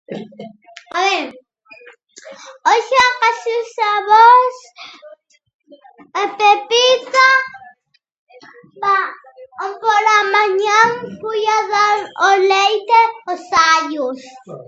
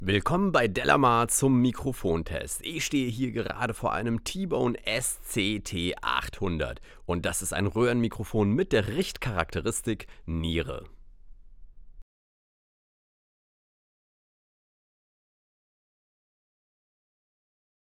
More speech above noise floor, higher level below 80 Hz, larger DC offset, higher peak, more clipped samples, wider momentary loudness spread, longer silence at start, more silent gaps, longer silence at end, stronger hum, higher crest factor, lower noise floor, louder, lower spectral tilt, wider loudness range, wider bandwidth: first, 41 dB vs 20 dB; second, -64 dBFS vs -46 dBFS; neither; first, 0 dBFS vs -6 dBFS; neither; first, 16 LU vs 10 LU; about the same, 0.1 s vs 0 s; first, 5.54-5.60 s, 8.18-8.27 s vs none; second, 0.05 s vs 5.95 s; neither; second, 16 dB vs 24 dB; first, -56 dBFS vs -47 dBFS; first, -14 LUFS vs -28 LUFS; second, -1.5 dB/octave vs -4.5 dB/octave; second, 4 LU vs 9 LU; second, 8.2 kHz vs 17 kHz